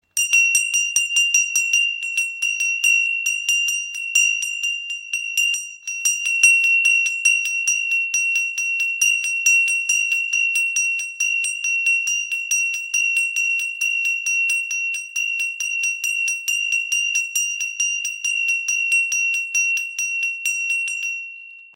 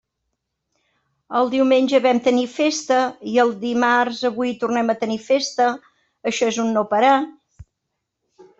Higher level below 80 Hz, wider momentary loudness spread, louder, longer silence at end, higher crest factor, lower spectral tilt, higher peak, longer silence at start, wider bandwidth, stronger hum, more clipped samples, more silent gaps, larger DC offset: second, -80 dBFS vs -62 dBFS; about the same, 7 LU vs 7 LU; about the same, -18 LUFS vs -19 LUFS; second, 0.1 s vs 0.95 s; about the same, 20 dB vs 16 dB; second, 8 dB/octave vs -3.5 dB/octave; about the same, -2 dBFS vs -4 dBFS; second, 0.15 s vs 1.3 s; first, 17 kHz vs 8 kHz; neither; neither; neither; neither